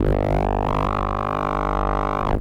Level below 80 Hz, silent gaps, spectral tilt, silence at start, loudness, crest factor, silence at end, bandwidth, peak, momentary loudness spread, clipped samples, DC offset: -26 dBFS; none; -8 dB/octave; 0 s; -23 LUFS; 12 dB; 0 s; 7.8 kHz; -8 dBFS; 2 LU; under 0.1%; 0.1%